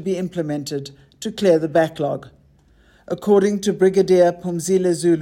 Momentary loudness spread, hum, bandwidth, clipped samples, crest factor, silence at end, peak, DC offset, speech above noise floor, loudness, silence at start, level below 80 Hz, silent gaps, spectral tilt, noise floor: 15 LU; none; 16 kHz; under 0.1%; 14 dB; 0 s; -4 dBFS; under 0.1%; 35 dB; -19 LUFS; 0 s; -56 dBFS; none; -6 dB/octave; -54 dBFS